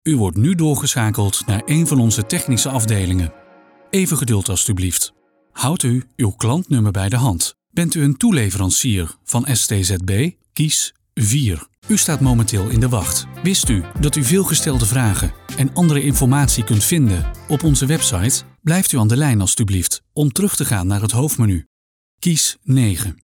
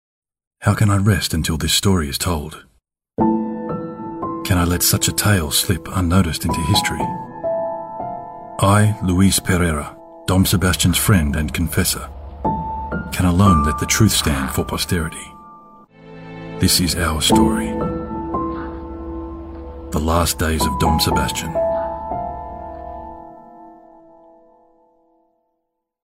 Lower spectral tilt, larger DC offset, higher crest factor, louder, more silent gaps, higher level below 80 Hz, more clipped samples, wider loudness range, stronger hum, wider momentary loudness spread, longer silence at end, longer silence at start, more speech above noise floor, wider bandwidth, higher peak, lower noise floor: about the same, -4.5 dB/octave vs -4.5 dB/octave; neither; about the same, 14 dB vs 18 dB; about the same, -17 LUFS vs -18 LUFS; first, 11.78-11.82 s, 21.66-22.18 s vs none; about the same, -34 dBFS vs -32 dBFS; neither; about the same, 3 LU vs 5 LU; neither; second, 6 LU vs 17 LU; second, 0.2 s vs 2.35 s; second, 0.05 s vs 0.6 s; second, 31 dB vs 58 dB; first, 19 kHz vs 16.5 kHz; about the same, -2 dBFS vs 0 dBFS; second, -48 dBFS vs -75 dBFS